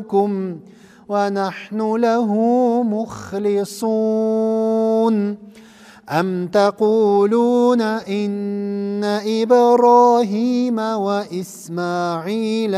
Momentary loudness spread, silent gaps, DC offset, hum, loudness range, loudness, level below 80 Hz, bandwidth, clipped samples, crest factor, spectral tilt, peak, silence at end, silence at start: 10 LU; none; under 0.1%; none; 4 LU; -18 LUFS; -66 dBFS; 15 kHz; under 0.1%; 14 dB; -6.5 dB/octave; -2 dBFS; 0 s; 0 s